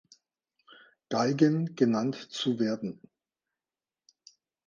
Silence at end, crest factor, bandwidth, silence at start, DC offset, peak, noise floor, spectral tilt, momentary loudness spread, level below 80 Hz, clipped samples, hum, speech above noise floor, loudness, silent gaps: 1.75 s; 22 dB; 7.4 kHz; 1.1 s; under 0.1%; -10 dBFS; under -90 dBFS; -6.5 dB/octave; 11 LU; -78 dBFS; under 0.1%; none; over 62 dB; -29 LUFS; none